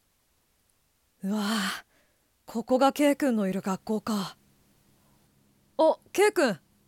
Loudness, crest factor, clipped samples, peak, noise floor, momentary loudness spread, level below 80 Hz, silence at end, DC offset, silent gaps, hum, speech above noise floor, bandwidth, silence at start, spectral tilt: -27 LUFS; 18 dB; under 0.1%; -10 dBFS; -70 dBFS; 14 LU; -70 dBFS; 0.3 s; under 0.1%; none; none; 44 dB; 17.5 kHz; 1.25 s; -4.5 dB/octave